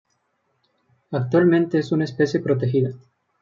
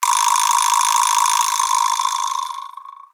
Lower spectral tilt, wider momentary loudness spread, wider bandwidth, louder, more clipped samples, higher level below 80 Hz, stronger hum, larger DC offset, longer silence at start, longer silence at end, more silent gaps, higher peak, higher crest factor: first, -8 dB/octave vs 7.5 dB/octave; about the same, 10 LU vs 11 LU; second, 7.4 kHz vs over 20 kHz; second, -21 LUFS vs -16 LUFS; neither; first, -66 dBFS vs -86 dBFS; neither; neither; first, 1.1 s vs 0 s; first, 0.45 s vs 0.25 s; neither; second, -6 dBFS vs -2 dBFS; about the same, 16 dB vs 16 dB